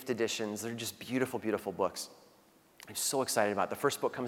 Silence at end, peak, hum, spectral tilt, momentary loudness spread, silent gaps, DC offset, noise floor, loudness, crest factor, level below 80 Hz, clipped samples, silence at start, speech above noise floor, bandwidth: 0 s; -14 dBFS; none; -3 dB/octave; 10 LU; none; under 0.1%; -64 dBFS; -34 LUFS; 22 dB; -76 dBFS; under 0.1%; 0 s; 30 dB; 18 kHz